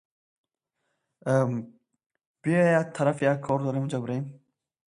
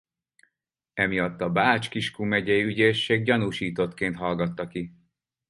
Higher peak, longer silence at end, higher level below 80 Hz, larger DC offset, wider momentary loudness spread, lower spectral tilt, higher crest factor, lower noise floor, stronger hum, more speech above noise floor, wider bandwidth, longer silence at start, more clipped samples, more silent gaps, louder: second, -8 dBFS vs -4 dBFS; about the same, 0.6 s vs 0.6 s; second, -68 dBFS vs -56 dBFS; neither; about the same, 12 LU vs 11 LU; first, -7.5 dB/octave vs -6 dB/octave; about the same, 20 dB vs 22 dB; about the same, -80 dBFS vs -82 dBFS; neither; about the same, 55 dB vs 57 dB; about the same, 11 kHz vs 11.5 kHz; first, 1.25 s vs 0.95 s; neither; first, 2.06-2.10 s, 2.26-2.34 s vs none; about the same, -26 LUFS vs -25 LUFS